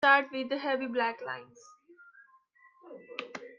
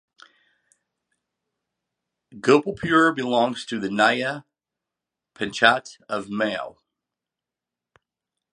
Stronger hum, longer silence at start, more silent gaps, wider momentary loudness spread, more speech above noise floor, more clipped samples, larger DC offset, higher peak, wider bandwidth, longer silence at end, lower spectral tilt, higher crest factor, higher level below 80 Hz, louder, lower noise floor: neither; second, 0 s vs 2.35 s; neither; first, 18 LU vs 13 LU; second, 33 dB vs 66 dB; neither; neither; second, -10 dBFS vs 0 dBFS; second, 7.6 kHz vs 11 kHz; second, 0.05 s vs 1.8 s; about the same, -3.5 dB/octave vs -4.5 dB/octave; about the same, 22 dB vs 26 dB; second, -84 dBFS vs -64 dBFS; second, -32 LUFS vs -22 LUFS; second, -63 dBFS vs -88 dBFS